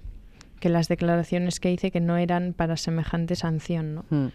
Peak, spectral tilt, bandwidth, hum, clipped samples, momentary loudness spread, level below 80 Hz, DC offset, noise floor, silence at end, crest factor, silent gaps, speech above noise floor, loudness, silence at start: -10 dBFS; -6.5 dB/octave; 12.5 kHz; none; under 0.1%; 4 LU; -46 dBFS; under 0.1%; -46 dBFS; 0 s; 16 dB; none; 21 dB; -26 LUFS; 0 s